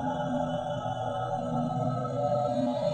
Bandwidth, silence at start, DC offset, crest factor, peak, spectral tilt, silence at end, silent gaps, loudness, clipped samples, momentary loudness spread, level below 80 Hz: 9 kHz; 0 s; under 0.1%; 12 dB; -18 dBFS; -7.5 dB/octave; 0 s; none; -30 LUFS; under 0.1%; 4 LU; -58 dBFS